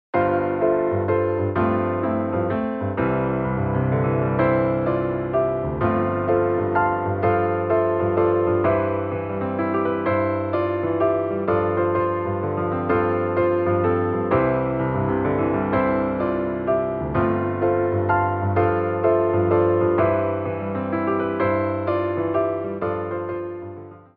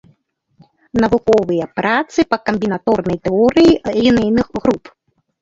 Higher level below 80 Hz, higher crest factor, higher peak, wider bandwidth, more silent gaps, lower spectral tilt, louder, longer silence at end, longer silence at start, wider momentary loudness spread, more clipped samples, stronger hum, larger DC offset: about the same, -46 dBFS vs -42 dBFS; about the same, 14 dB vs 16 dB; second, -6 dBFS vs 0 dBFS; second, 4.6 kHz vs 7.8 kHz; neither; first, -12 dB/octave vs -6.5 dB/octave; second, -22 LUFS vs -15 LUFS; second, 0.15 s vs 0.65 s; second, 0.15 s vs 0.95 s; about the same, 5 LU vs 7 LU; neither; neither; neither